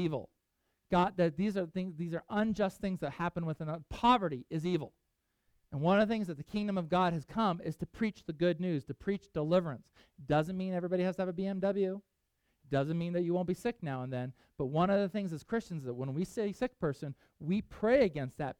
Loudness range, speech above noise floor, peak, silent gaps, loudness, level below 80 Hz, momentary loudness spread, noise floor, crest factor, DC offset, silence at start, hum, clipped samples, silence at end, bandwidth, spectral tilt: 2 LU; 47 dB; -14 dBFS; none; -34 LUFS; -60 dBFS; 11 LU; -81 dBFS; 20 dB; under 0.1%; 0 s; none; under 0.1%; 0.05 s; 13 kHz; -7.5 dB/octave